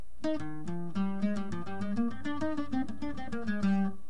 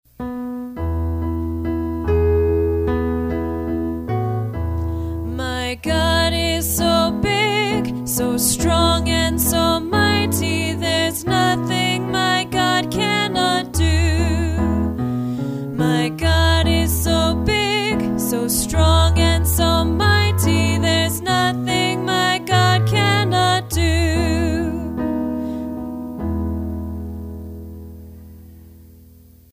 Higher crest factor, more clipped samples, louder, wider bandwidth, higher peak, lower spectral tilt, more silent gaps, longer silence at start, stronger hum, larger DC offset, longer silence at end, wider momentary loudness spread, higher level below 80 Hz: about the same, 14 dB vs 16 dB; neither; second, -34 LUFS vs -19 LUFS; second, 10 kHz vs 16 kHz; second, -18 dBFS vs -2 dBFS; first, -7.5 dB/octave vs -4.5 dB/octave; neither; about the same, 0.15 s vs 0.2 s; neither; first, 2% vs under 0.1%; second, 0 s vs 0.6 s; about the same, 8 LU vs 9 LU; second, -56 dBFS vs -28 dBFS